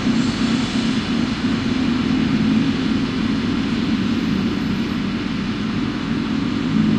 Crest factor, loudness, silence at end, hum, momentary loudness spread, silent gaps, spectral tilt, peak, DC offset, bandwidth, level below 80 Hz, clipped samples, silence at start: 14 dB; -20 LUFS; 0 s; none; 4 LU; none; -6 dB/octave; -4 dBFS; under 0.1%; 9.8 kHz; -38 dBFS; under 0.1%; 0 s